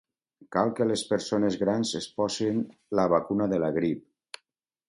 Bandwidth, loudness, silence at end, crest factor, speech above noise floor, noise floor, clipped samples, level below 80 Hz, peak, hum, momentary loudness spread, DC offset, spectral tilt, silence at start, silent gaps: 11.5 kHz; -27 LUFS; 0.9 s; 18 dB; 51 dB; -78 dBFS; under 0.1%; -62 dBFS; -10 dBFS; none; 12 LU; under 0.1%; -5.5 dB/octave; 0.5 s; none